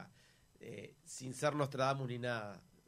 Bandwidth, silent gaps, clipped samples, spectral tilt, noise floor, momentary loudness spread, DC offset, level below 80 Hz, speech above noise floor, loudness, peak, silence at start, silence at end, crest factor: 15.5 kHz; none; under 0.1%; -5 dB/octave; -67 dBFS; 16 LU; under 0.1%; -76 dBFS; 29 dB; -39 LUFS; -20 dBFS; 0 s; 0.25 s; 20 dB